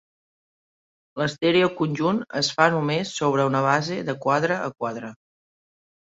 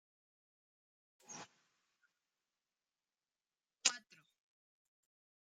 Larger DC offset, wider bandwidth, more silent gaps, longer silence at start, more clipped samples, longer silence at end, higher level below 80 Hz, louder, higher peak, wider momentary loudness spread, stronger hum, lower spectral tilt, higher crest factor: neither; second, 8 kHz vs 13 kHz; neither; second, 1.15 s vs 1.3 s; neither; second, 1 s vs 1.45 s; first, -66 dBFS vs under -90 dBFS; first, -23 LUFS vs -37 LUFS; first, -2 dBFS vs -10 dBFS; second, 10 LU vs 19 LU; neither; first, -5 dB/octave vs 2 dB/octave; second, 22 dB vs 40 dB